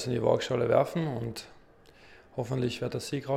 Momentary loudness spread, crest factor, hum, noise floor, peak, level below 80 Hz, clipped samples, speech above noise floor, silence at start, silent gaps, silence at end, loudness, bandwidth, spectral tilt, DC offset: 13 LU; 22 dB; none; -56 dBFS; -10 dBFS; -62 dBFS; under 0.1%; 27 dB; 0 s; none; 0 s; -30 LUFS; 15.5 kHz; -6 dB/octave; under 0.1%